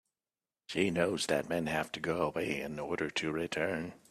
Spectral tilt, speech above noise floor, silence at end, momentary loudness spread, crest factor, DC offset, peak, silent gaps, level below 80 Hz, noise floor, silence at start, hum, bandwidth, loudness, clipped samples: -4.5 dB/octave; over 56 dB; 0.15 s; 6 LU; 22 dB; under 0.1%; -14 dBFS; none; -66 dBFS; under -90 dBFS; 0.7 s; none; 14.5 kHz; -34 LUFS; under 0.1%